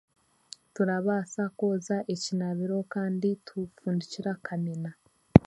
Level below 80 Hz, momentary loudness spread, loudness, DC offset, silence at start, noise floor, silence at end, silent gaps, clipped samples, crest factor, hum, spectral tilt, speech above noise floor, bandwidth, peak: -48 dBFS; 10 LU; -30 LUFS; under 0.1%; 0.8 s; -52 dBFS; 0.05 s; none; under 0.1%; 28 dB; none; -7 dB/octave; 22 dB; 11.5 kHz; 0 dBFS